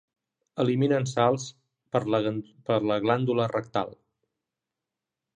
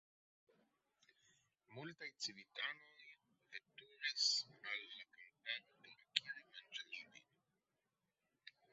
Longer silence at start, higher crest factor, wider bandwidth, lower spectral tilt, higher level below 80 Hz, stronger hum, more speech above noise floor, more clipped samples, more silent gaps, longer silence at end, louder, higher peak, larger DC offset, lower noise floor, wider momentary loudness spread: second, 0.55 s vs 1.7 s; second, 20 dB vs 36 dB; first, 10 kHz vs 7.6 kHz; first, -6.5 dB/octave vs 1.5 dB/octave; first, -68 dBFS vs under -90 dBFS; neither; first, 62 dB vs 39 dB; neither; neither; first, 1.45 s vs 0.25 s; first, -27 LUFS vs -45 LUFS; first, -8 dBFS vs -14 dBFS; neither; about the same, -88 dBFS vs -90 dBFS; second, 9 LU vs 25 LU